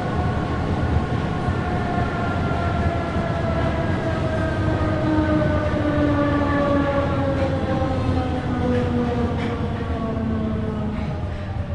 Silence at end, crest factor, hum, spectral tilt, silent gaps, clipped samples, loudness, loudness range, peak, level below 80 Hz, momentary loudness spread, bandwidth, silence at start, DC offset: 0 s; 14 dB; none; -8 dB/octave; none; under 0.1%; -22 LUFS; 3 LU; -8 dBFS; -34 dBFS; 5 LU; 10 kHz; 0 s; under 0.1%